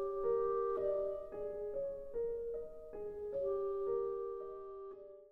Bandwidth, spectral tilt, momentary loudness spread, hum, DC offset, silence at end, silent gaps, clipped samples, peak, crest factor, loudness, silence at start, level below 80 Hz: 3.8 kHz; -9 dB/octave; 13 LU; none; under 0.1%; 0 s; none; under 0.1%; -26 dBFS; 14 dB; -40 LUFS; 0 s; -62 dBFS